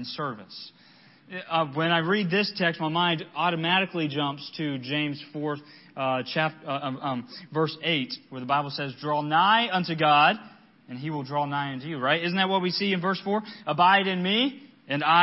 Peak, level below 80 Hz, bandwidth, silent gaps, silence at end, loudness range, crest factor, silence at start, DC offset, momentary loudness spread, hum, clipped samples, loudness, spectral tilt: -6 dBFS; -76 dBFS; 6 kHz; none; 0 s; 5 LU; 20 dB; 0 s; under 0.1%; 13 LU; none; under 0.1%; -26 LUFS; -9 dB/octave